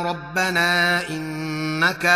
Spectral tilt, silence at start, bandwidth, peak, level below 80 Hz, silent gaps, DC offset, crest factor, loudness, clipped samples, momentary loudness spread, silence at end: -4 dB/octave; 0 s; 15.5 kHz; -4 dBFS; -54 dBFS; none; under 0.1%; 16 dB; -21 LUFS; under 0.1%; 10 LU; 0 s